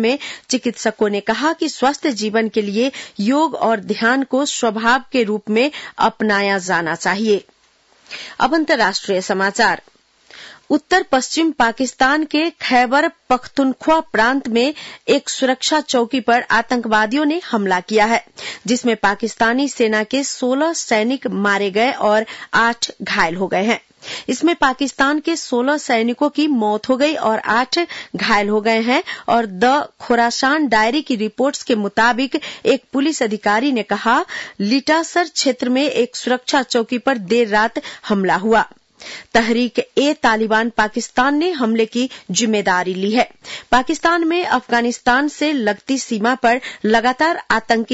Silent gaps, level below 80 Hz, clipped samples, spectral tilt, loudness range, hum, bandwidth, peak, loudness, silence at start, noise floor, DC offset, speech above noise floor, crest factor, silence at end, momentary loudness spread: none; -52 dBFS; under 0.1%; -3.5 dB/octave; 2 LU; none; 8 kHz; -4 dBFS; -17 LUFS; 0 s; -55 dBFS; under 0.1%; 38 dB; 14 dB; 0 s; 5 LU